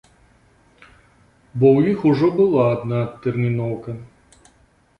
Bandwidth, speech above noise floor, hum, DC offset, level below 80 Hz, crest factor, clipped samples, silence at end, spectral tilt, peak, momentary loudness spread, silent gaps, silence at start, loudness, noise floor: 9.6 kHz; 39 dB; none; under 0.1%; -54 dBFS; 18 dB; under 0.1%; 0.95 s; -9.5 dB/octave; -2 dBFS; 16 LU; none; 1.55 s; -18 LUFS; -57 dBFS